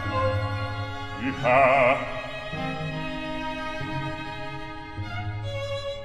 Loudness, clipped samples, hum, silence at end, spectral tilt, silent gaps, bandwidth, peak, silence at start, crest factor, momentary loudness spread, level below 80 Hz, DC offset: -27 LUFS; under 0.1%; none; 0 s; -6.5 dB/octave; none; 11.5 kHz; -6 dBFS; 0 s; 20 dB; 15 LU; -44 dBFS; under 0.1%